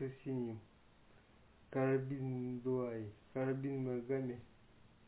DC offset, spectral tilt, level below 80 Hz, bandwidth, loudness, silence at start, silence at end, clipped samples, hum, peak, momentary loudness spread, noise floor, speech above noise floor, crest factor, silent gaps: under 0.1%; -9 dB/octave; -72 dBFS; 4 kHz; -41 LUFS; 0 s; 0.2 s; under 0.1%; none; -24 dBFS; 10 LU; -66 dBFS; 26 dB; 16 dB; none